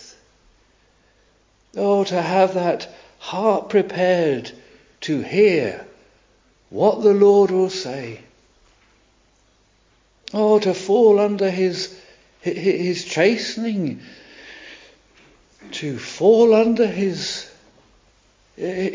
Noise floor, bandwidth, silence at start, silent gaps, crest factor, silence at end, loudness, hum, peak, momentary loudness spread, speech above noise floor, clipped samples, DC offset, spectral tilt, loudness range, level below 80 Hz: -59 dBFS; 7.6 kHz; 1.75 s; none; 18 dB; 0 s; -19 LUFS; none; -2 dBFS; 21 LU; 41 dB; under 0.1%; under 0.1%; -5.5 dB/octave; 5 LU; -62 dBFS